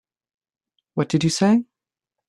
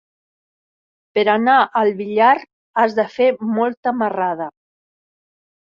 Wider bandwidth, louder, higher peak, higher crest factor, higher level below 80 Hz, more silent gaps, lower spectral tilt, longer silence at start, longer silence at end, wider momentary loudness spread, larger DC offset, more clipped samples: first, 12.5 kHz vs 7 kHz; second, -20 LUFS vs -17 LUFS; second, -6 dBFS vs -2 dBFS; about the same, 18 dB vs 18 dB; first, -62 dBFS vs -70 dBFS; second, none vs 2.53-2.74 s, 3.77-3.83 s; about the same, -5.5 dB/octave vs -6.5 dB/octave; second, 0.95 s vs 1.15 s; second, 0.65 s vs 1.3 s; about the same, 9 LU vs 9 LU; neither; neither